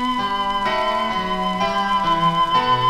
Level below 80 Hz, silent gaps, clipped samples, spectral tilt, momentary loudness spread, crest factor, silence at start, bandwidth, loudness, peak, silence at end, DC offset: -40 dBFS; none; under 0.1%; -5 dB/octave; 4 LU; 14 dB; 0 s; 14.5 kHz; -19 LUFS; -6 dBFS; 0 s; 0.3%